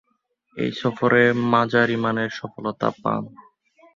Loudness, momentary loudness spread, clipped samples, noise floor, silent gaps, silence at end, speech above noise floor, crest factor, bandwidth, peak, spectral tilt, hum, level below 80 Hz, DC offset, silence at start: -21 LUFS; 13 LU; under 0.1%; -68 dBFS; none; 0.55 s; 47 dB; 20 dB; 7.4 kHz; -2 dBFS; -7 dB/octave; none; -60 dBFS; under 0.1%; 0.55 s